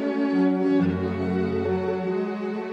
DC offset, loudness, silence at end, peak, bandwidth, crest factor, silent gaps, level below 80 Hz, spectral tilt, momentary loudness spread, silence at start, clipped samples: under 0.1%; -24 LUFS; 0 s; -12 dBFS; 6.4 kHz; 12 dB; none; -58 dBFS; -9 dB/octave; 6 LU; 0 s; under 0.1%